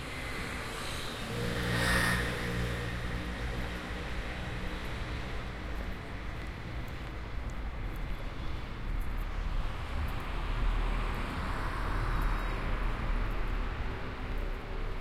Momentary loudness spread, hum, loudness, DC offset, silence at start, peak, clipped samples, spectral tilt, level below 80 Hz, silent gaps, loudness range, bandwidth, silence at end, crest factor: 8 LU; none; -36 LUFS; under 0.1%; 0 s; -16 dBFS; under 0.1%; -5 dB/octave; -36 dBFS; none; 7 LU; 15.5 kHz; 0 s; 18 dB